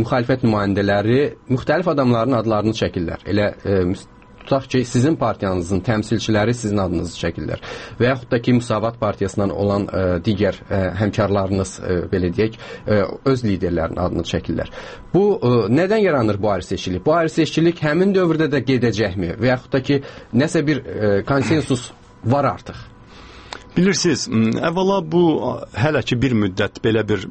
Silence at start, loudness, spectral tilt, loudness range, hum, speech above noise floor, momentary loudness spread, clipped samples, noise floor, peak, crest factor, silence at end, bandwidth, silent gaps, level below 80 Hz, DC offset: 0 s; -19 LUFS; -6.5 dB/octave; 3 LU; none; 22 dB; 7 LU; under 0.1%; -41 dBFS; -2 dBFS; 18 dB; 0 s; 8.8 kHz; none; -42 dBFS; under 0.1%